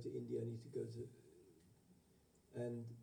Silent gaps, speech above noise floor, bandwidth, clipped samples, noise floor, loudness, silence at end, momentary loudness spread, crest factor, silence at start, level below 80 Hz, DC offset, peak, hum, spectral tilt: none; 25 dB; 19.5 kHz; under 0.1%; -73 dBFS; -48 LUFS; 0 s; 21 LU; 16 dB; 0 s; -82 dBFS; under 0.1%; -34 dBFS; none; -8.5 dB/octave